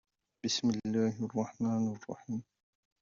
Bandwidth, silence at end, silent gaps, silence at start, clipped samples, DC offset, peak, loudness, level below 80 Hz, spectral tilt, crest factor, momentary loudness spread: 7.6 kHz; 0.6 s; none; 0.45 s; under 0.1%; under 0.1%; -18 dBFS; -34 LUFS; -72 dBFS; -5.5 dB/octave; 16 dB; 10 LU